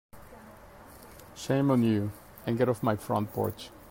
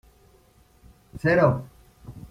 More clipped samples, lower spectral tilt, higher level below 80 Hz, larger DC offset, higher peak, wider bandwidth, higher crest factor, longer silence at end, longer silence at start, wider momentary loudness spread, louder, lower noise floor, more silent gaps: neither; second, -7 dB/octave vs -8.5 dB/octave; second, -60 dBFS vs -52 dBFS; neither; second, -12 dBFS vs -6 dBFS; first, 16.5 kHz vs 14.5 kHz; about the same, 18 dB vs 22 dB; about the same, 0 s vs 0.05 s; second, 0.15 s vs 1.15 s; about the same, 25 LU vs 26 LU; second, -29 LUFS vs -22 LUFS; second, -50 dBFS vs -58 dBFS; neither